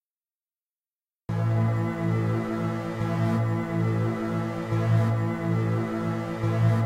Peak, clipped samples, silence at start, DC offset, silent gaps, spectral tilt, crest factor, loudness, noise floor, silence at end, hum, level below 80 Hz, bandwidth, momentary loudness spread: -12 dBFS; under 0.1%; 1.3 s; under 0.1%; none; -8.5 dB/octave; 14 dB; -27 LUFS; under -90 dBFS; 0 s; none; -54 dBFS; 9.2 kHz; 6 LU